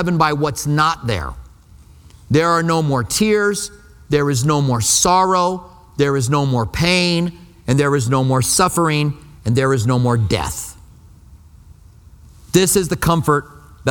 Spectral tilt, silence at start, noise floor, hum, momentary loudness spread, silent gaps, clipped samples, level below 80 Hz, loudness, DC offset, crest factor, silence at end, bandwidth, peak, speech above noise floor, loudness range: -4.5 dB/octave; 0 s; -44 dBFS; none; 10 LU; none; under 0.1%; -40 dBFS; -17 LUFS; under 0.1%; 18 dB; 0 s; 19 kHz; 0 dBFS; 28 dB; 4 LU